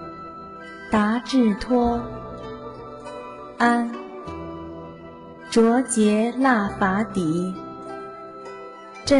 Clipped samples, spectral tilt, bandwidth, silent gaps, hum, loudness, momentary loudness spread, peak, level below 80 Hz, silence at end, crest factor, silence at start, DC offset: under 0.1%; -5 dB/octave; 11 kHz; none; none; -21 LUFS; 18 LU; -8 dBFS; -48 dBFS; 0 s; 16 dB; 0 s; under 0.1%